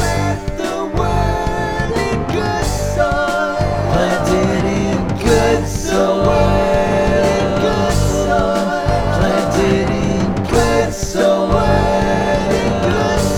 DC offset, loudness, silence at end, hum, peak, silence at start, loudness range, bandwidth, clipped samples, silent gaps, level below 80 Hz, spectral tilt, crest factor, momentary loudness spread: under 0.1%; -16 LUFS; 0 s; none; 0 dBFS; 0 s; 2 LU; 19.5 kHz; under 0.1%; none; -26 dBFS; -5.5 dB/octave; 14 dB; 5 LU